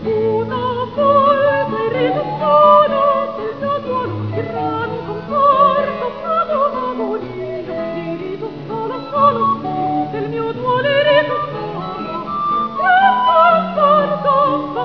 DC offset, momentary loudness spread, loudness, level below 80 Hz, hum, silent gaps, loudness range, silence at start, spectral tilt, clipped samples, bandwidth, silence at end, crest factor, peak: 0.4%; 13 LU; -16 LUFS; -52 dBFS; none; none; 5 LU; 0 s; -8 dB/octave; under 0.1%; 5.4 kHz; 0 s; 16 dB; 0 dBFS